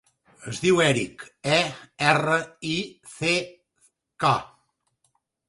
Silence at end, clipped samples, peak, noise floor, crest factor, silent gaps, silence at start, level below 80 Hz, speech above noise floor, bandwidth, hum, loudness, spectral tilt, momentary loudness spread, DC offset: 1.05 s; under 0.1%; -2 dBFS; -72 dBFS; 24 dB; none; 0.4 s; -60 dBFS; 48 dB; 11.5 kHz; none; -24 LUFS; -4 dB/octave; 15 LU; under 0.1%